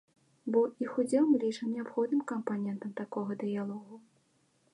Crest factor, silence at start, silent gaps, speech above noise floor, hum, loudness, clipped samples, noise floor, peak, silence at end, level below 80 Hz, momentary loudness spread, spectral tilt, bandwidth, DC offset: 18 dB; 0.45 s; none; 39 dB; none; -32 LUFS; under 0.1%; -71 dBFS; -16 dBFS; 0.75 s; -84 dBFS; 11 LU; -7 dB/octave; 11.5 kHz; under 0.1%